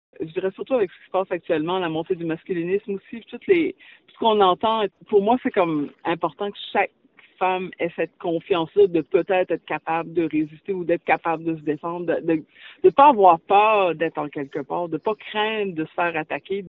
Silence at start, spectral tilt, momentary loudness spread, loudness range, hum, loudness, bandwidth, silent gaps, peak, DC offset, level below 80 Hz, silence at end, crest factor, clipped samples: 0.2 s; -3.5 dB/octave; 11 LU; 6 LU; none; -22 LUFS; 4.2 kHz; none; 0 dBFS; under 0.1%; -66 dBFS; 0 s; 22 dB; under 0.1%